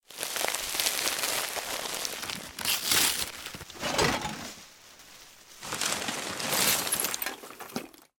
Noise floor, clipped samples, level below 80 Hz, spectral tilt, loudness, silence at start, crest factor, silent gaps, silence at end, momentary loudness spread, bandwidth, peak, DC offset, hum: -52 dBFS; under 0.1%; -58 dBFS; -1 dB/octave; -28 LUFS; 0.1 s; 26 dB; none; 0.15 s; 19 LU; 17.5 kHz; -6 dBFS; under 0.1%; none